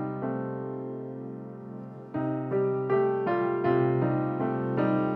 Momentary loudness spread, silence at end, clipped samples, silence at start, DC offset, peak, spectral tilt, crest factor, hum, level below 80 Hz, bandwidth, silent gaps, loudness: 15 LU; 0 s; under 0.1%; 0 s; under 0.1%; -12 dBFS; -11 dB/octave; 16 dB; none; -68 dBFS; 4.6 kHz; none; -29 LUFS